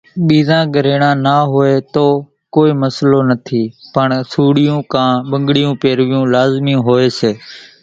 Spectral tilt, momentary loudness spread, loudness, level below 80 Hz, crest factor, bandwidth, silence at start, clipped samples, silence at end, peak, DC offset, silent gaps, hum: -7.5 dB/octave; 6 LU; -13 LUFS; -52 dBFS; 12 dB; 7.8 kHz; 0.15 s; under 0.1%; 0.2 s; 0 dBFS; under 0.1%; none; none